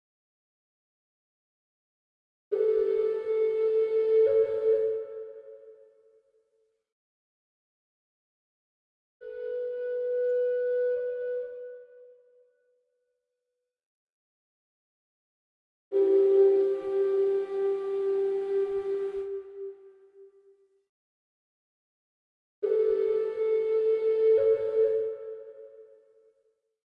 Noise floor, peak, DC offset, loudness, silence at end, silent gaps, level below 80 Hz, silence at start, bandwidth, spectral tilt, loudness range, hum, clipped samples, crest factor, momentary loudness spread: -85 dBFS; -14 dBFS; under 0.1%; -27 LUFS; 1 s; 6.92-9.20 s, 13.86-15.91 s, 20.89-22.62 s; -76 dBFS; 2.5 s; 4.7 kHz; -7 dB/octave; 13 LU; none; under 0.1%; 16 dB; 18 LU